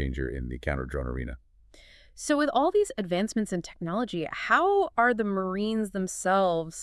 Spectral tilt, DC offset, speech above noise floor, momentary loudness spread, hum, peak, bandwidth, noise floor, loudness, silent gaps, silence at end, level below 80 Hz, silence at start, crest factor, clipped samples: -5 dB/octave; under 0.1%; 28 dB; 10 LU; none; -8 dBFS; 12 kHz; -55 dBFS; -27 LUFS; none; 0 s; -42 dBFS; 0 s; 20 dB; under 0.1%